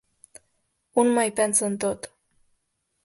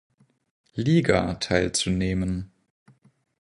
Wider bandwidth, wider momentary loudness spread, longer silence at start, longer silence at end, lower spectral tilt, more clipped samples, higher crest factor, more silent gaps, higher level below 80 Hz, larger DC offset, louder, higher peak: about the same, 12 kHz vs 11 kHz; about the same, 12 LU vs 13 LU; first, 0.95 s vs 0.75 s; about the same, 1 s vs 1 s; second, -3.5 dB/octave vs -5 dB/octave; neither; about the same, 18 dB vs 22 dB; neither; second, -66 dBFS vs -44 dBFS; neither; about the same, -23 LUFS vs -24 LUFS; second, -8 dBFS vs -4 dBFS